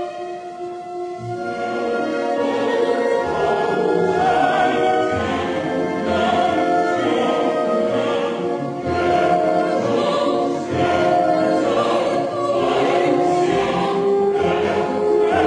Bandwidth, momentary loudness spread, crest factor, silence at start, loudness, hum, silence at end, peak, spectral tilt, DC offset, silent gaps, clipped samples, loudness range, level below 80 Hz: 10.5 kHz; 7 LU; 14 dB; 0 s; -19 LUFS; none; 0 s; -4 dBFS; -6 dB/octave; under 0.1%; none; under 0.1%; 2 LU; -52 dBFS